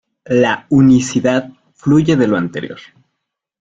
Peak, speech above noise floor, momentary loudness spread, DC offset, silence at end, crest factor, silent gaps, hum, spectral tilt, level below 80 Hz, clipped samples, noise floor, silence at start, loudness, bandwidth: -2 dBFS; 63 dB; 14 LU; under 0.1%; 0.8 s; 14 dB; none; none; -6.5 dB/octave; -48 dBFS; under 0.1%; -76 dBFS; 0.25 s; -14 LUFS; 8.4 kHz